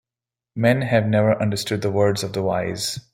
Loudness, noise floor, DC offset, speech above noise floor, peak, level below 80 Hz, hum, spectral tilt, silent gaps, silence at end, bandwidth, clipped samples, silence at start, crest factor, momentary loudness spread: -21 LUFS; -89 dBFS; under 0.1%; 69 dB; -2 dBFS; -56 dBFS; none; -5.5 dB/octave; none; 0.15 s; 16.5 kHz; under 0.1%; 0.55 s; 18 dB; 6 LU